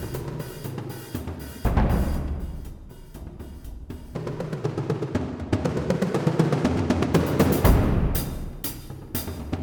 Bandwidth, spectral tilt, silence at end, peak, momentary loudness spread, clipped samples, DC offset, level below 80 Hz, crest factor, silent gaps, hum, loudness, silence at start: over 20 kHz; -6.5 dB/octave; 0 s; -4 dBFS; 19 LU; under 0.1%; under 0.1%; -32 dBFS; 20 dB; none; none; -26 LUFS; 0 s